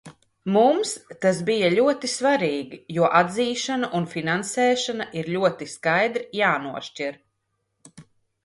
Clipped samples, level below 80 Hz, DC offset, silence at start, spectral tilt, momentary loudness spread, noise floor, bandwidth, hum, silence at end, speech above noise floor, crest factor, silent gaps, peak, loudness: under 0.1%; -68 dBFS; under 0.1%; 0.05 s; -4.5 dB/octave; 11 LU; -75 dBFS; 11.5 kHz; none; 0.4 s; 53 dB; 20 dB; none; -4 dBFS; -23 LUFS